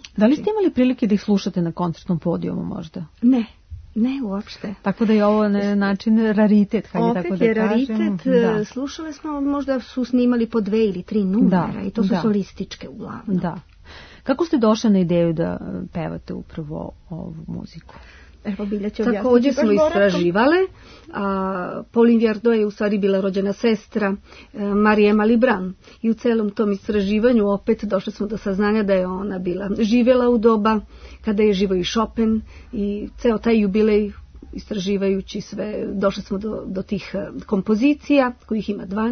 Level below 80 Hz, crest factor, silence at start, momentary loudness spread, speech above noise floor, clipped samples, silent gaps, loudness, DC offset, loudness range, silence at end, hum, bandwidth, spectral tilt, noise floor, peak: -46 dBFS; 16 dB; 0.05 s; 14 LU; 23 dB; under 0.1%; none; -20 LUFS; under 0.1%; 5 LU; 0 s; none; 6.6 kHz; -7 dB/octave; -42 dBFS; -4 dBFS